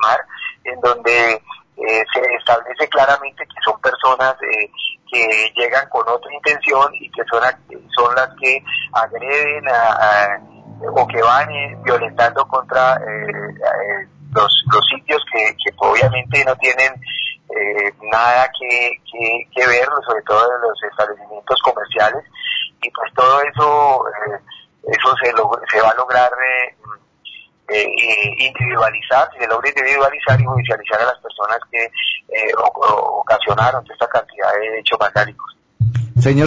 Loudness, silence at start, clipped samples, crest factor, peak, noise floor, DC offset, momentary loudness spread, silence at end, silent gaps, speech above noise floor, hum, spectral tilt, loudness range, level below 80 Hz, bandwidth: -15 LUFS; 0 s; under 0.1%; 14 dB; -2 dBFS; -40 dBFS; under 0.1%; 9 LU; 0 s; none; 24 dB; none; -5 dB/octave; 2 LU; -48 dBFS; 7.8 kHz